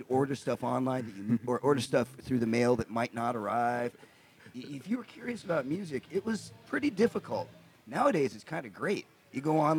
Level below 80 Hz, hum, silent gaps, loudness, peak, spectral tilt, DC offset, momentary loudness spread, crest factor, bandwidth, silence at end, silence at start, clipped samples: -70 dBFS; none; none; -32 LUFS; -14 dBFS; -6.5 dB/octave; under 0.1%; 12 LU; 18 dB; 19.5 kHz; 0 s; 0 s; under 0.1%